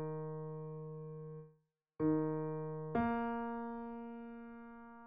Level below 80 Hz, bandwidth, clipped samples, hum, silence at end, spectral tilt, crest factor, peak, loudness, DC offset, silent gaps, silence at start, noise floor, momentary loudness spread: -68 dBFS; 4.6 kHz; under 0.1%; none; 0 s; -8.5 dB/octave; 18 dB; -24 dBFS; -41 LUFS; under 0.1%; none; 0 s; -74 dBFS; 16 LU